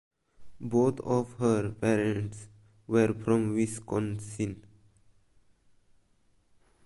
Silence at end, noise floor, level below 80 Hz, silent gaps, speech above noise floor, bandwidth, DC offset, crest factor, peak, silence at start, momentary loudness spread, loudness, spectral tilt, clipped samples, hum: 2.2 s; -68 dBFS; -60 dBFS; none; 39 dB; 11.5 kHz; under 0.1%; 18 dB; -12 dBFS; 0.4 s; 9 LU; -29 LUFS; -7 dB/octave; under 0.1%; none